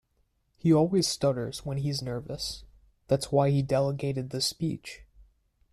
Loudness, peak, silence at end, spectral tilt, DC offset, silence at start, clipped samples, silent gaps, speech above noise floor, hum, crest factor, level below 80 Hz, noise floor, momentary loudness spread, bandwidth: -28 LUFS; -12 dBFS; 0.5 s; -5.5 dB/octave; under 0.1%; 0.65 s; under 0.1%; none; 45 dB; none; 18 dB; -54 dBFS; -72 dBFS; 12 LU; 14 kHz